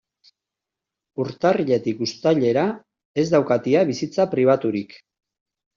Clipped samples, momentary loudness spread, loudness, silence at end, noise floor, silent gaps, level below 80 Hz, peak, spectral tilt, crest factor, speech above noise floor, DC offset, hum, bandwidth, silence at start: under 0.1%; 11 LU; -21 LUFS; 0.8 s; -86 dBFS; 3.05-3.14 s; -64 dBFS; -4 dBFS; -5.5 dB/octave; 18 dB; 66 dB; under 0.1%; none; 7.4 kHz; 1.2 s